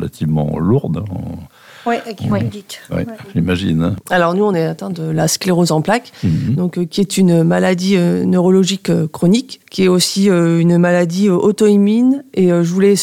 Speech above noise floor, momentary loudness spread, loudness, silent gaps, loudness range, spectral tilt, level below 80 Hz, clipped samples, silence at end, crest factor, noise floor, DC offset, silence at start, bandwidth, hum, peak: 21 dB; 11 LU; -15 LUFS; none; 7 LU; -6 dB/octave; -44 dBFS; under 0.1%; 0 s; 12 dB; -35 dBFS; under 0.1%; 0 s; 16 kHz; none; -2 dBFS